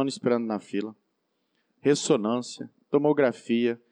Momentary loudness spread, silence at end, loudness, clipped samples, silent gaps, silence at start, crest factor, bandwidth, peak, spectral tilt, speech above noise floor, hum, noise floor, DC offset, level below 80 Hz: 11 LU; 0.15 s; -26 LUFS; under 0.1%; none; 0 s; 16 dB; 10.5 kHz; -10 dBFS; -5 dB/octave; 50 dB; none; -76 dBFS; under 0.1%; under -90 dBFS